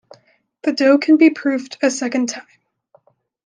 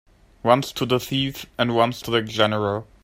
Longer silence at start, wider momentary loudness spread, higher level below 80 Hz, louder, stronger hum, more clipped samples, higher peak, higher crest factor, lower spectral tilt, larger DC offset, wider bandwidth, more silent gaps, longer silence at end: first, 0.65 s vs 0.45 s; first, 12 LU vs 6 LU; second, -72 dBFS vs -52 dBFS; first, -17 LUFS vs -22 LUFS; neither; neither; about the same, -2 dBFS vs -2 dBFS; second, 16 dB vs 22 dB; second, -3 dB/octave vs -5 dB/octave; neither; second, 9.8 kHz vs 16 kHz; neither; first, 1.05 s vs 0.2 s